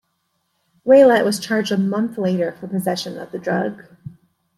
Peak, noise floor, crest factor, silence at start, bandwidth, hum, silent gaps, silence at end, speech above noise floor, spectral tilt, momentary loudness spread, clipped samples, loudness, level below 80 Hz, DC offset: -2 dBFS; -70 dBFS; 16 dB; 0.85 s; 14 kHz; none; none; 0.45 s; 52 dB; -5.5 dB/octave; 16 LU; under 0.1%; -18 LUFS; -66 dBFS; under 0.1%